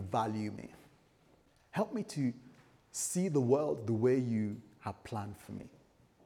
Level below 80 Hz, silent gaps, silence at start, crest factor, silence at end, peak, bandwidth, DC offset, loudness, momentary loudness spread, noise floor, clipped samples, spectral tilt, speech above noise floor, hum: -72 dBFS; none; 0 s; 20 dB; 0.55 s; -16 dBFS; over 20 kHz; under 0.1%; -35 LUFS; 18 LU; -67 dBFS; under 0.1%; -6 dB/octave; 33 dB; none